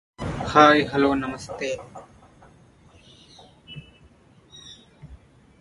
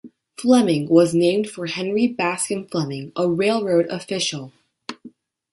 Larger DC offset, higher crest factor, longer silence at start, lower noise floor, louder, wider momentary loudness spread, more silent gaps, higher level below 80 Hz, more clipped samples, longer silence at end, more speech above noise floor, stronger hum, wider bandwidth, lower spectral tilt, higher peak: neither; first, 26 dB vs 18 dB; first, 0.2 s vs 0.05 s; first, -54 dBFS vs -46 dBFS; about the same, -21 LUFS vs -20 LUFS; first, 28 LU vs 18 LU; neither; first, -50 dBFS vs -64 dBFS; neither; about the same, 0.45 s vs 0.45 s; first, 34 dB vs 27 dB; neither; about the same, 11.5 kHz vs 11.5 kHz; about the same, -5 dB/octave vs -5 dB/octave; about the same, 0 dBFS vs -2 dBFS